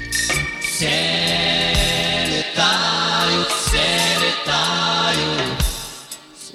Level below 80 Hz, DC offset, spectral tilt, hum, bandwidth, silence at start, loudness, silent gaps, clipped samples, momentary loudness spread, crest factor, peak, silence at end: -32 dBFS; under 0.1%; -2.5 dB/octave; none; 16.5 kHz; 0 s; -17 LUFS; none; under 0.1%; 7 LU; 16 dB; -4 dBFS; 0 s